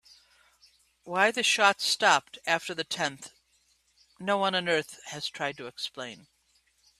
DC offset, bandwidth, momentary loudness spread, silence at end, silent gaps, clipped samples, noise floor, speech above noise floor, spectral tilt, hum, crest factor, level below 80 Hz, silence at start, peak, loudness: under 0.1%; 14.5 kHz; 16 LU; 0.85 s; none; under 0.1%; -69 dBFS; 41 dB; -2 dB/octave; none; 24 dB; -74 dBFS; 1.05 s; -6 dBFS; -27 LUFS